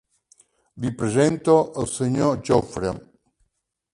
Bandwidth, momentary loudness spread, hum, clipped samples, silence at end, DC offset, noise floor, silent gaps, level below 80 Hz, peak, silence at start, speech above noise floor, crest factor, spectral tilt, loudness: 11.5 kHz; 11 LU; none; under 0.1%; 0.95 s; under 0.1%; -74 dBFS; none; -50 dBFS; -4 dBFS; 0.75 s; 53 dB; 20 dB; -6 dB/octave; -22 LUFS